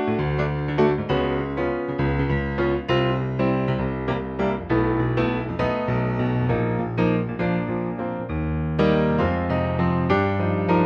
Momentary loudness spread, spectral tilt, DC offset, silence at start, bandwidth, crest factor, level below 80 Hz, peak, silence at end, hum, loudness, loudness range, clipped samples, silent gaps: 5 LU; -9 dB/octave; under 0.1%; 0 s; 6.6 kHz; 16 dB; -38 dBFS; -6 dBFS; 0 s; none; -23 LUFS; 1 LU; under 0.1%; none